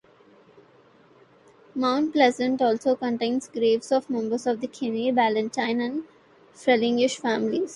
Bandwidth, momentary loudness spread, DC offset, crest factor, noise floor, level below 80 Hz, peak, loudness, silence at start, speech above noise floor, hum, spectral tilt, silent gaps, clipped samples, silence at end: 11.5 kHz; 8 LU; under 0.1%; 18 dB; -56 dBFS; -70 dBFS; -6 dBFS; -24 LUFS; 1.75 s; 32 dB; none; -4 dB/octave; none; under 0.1%; 0 s